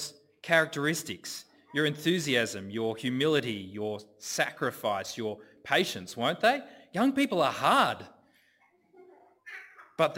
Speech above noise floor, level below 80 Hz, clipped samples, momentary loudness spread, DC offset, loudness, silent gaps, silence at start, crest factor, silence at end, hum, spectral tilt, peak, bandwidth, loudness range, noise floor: 38 dB; -72 dBFS; under 0.1%; 15 LU; under 0.1%; -29 LUFS; none; 0 s; 22 dB; 0 s; none; -4 dB/octave; -8 dBFS; 16.5 kHz; 3 LU; -67 dBFS